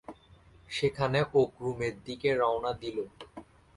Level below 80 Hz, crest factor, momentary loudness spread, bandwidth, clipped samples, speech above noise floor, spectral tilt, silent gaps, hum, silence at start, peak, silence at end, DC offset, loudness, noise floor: -58 dBFS; 20 dB; 21 LU; 11.5 kHz; under 0.1%; 28 dB; -6 dB/octave; none; none; 0.1 s; -12 dBFS; 0.35 s; under 0.1%; -30 LUFS; -58 dBFS